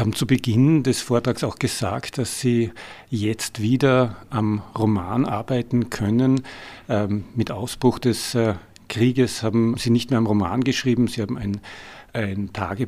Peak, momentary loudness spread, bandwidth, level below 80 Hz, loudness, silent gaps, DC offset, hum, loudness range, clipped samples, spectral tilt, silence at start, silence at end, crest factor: -4 dBFS; 9 LU; 15.5 kHz; -50 dBFS; -22 LUFS; none; under 0.1%; none; 2 LU; under 0.1%; -6 dB/octave; 0 s; 0 s; 18 dB